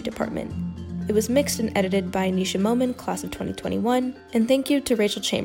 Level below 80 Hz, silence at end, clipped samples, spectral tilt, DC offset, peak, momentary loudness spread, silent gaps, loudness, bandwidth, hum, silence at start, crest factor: -52 dBFS; 0 s; under 0.1%; -5 dB/octave; under 0.1%; -8 dBFS; 9 LU; none; -24 LUFS; 16.5 kHz; none; 0 s; 16 dB